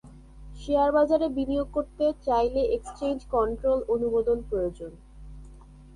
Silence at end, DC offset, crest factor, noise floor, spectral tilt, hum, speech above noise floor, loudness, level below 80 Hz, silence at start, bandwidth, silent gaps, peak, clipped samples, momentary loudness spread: 0.05 s; under 0.1%; 16 dB; -48 dBFS; -7 dB/octave; none; 22 dB; -26 LUFS; -44 dBFS; 0.05 s; 11 kHz; none; -12 dBFS; under 0.1%; 9 LU